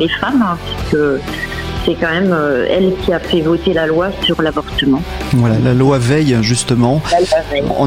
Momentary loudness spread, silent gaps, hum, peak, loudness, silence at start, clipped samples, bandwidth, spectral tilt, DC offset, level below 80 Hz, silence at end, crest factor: 5 LU; none; none; -2 dBFS; -14 LUFS; 0 s; under 0.1%; 15.5 kHz; -5.5 dB/octave; under 0.1%; -30 dBFS; 0 s; 12 dB